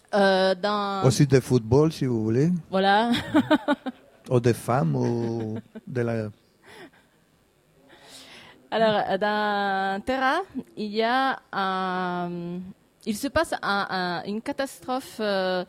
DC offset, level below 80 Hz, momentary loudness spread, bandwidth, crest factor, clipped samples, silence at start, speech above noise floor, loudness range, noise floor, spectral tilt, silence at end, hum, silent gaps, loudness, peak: under 0.1%; -56 dBFS; 13 LU; 16 kHz; 20 dB; under 0.1%; 0.1 s; 38 dB; 8 LU; -62 dBFS; -6 dB/octave; 0.05 s; none; none; -25 LUFS; -4 dBFS